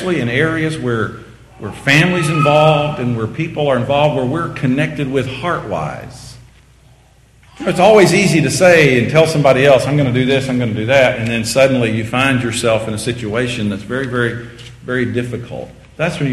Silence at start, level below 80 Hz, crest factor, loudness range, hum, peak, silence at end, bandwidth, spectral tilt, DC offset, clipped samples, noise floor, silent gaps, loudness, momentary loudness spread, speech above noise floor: 0 s; -42 dBFS; 14 dB; 9 LU; none; 0 dBFS; 0 s; 13 kHz; -5.5 dB/octave; under 0.1%; 0.1%; -47 dBFS; none; -14 LUFS; 14 LU; 33 dB